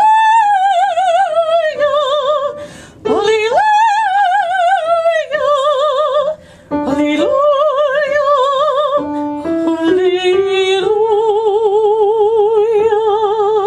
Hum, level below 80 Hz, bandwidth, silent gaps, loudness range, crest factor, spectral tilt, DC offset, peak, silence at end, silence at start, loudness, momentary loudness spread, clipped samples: none; -52 dBFS; 10.5 kHz; none; 2 LU; 12 dB; -4 dB/octave; under 0.1%; -2 dBFS; 0 s; 0 s; -13 LUFS; 6 LU; under 0.1%